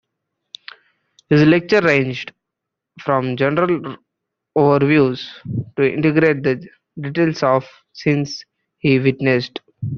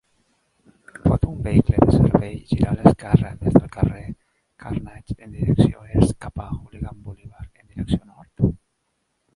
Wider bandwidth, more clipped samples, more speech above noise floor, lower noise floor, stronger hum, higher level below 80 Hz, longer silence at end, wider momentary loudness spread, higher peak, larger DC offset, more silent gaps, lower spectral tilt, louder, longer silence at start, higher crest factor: second, 7.2 kHz vs 11.5 kHz; neither; first, 65 dB vs 53 dB; first, -81 dBFS vs -72 dBFS; neither; second, -56 dBFS vs -34 dBFS; second, 0 s vs 0.8 s; second, 17 LU vs 22 LU; about the same, -2 dBFS vs 0 dBFS; neither; neither; second, -5.5 dB/octave vs -9 dB/octave; first, -17 LUFS vs -20 LUFS; first, 1.3 s vs 1.05 s; about the same, 16 dB vs 20 dB